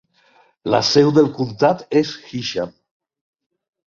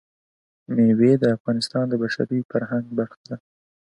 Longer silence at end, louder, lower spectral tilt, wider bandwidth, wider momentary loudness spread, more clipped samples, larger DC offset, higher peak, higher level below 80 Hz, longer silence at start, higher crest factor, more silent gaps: first, 1.2 s vs 0.45 s; first, -18 LUFS vs -22 LUFS; second, -5.5 dB/octave vs -7 dB/octave; second, 7.4 kHz vs 11.5 kHz; about the same, 13 LU vs 15 LU; neither; neither; first, -2 dBFS vs -6 dBFS; first, -58 dBFS vs -64 dBFS; about the same, 0.65 s vs 0.7 s; about the same, 18 dB vs 16 dB; second, none vs 1.40-1.45 s, 2.45-2.49 s, 3.17-3.24 s